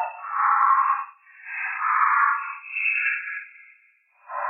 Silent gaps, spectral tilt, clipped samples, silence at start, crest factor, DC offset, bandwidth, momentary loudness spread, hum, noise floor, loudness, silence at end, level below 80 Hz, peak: none; -0.5 dB/octave; under 0.1%; 0 s; 18 dB; under 0.1%; 3.7 kHz; 17 LU; none; -60 dBFS; -22 LUFS; 0 s; under -90 dBFS; -8 dBFS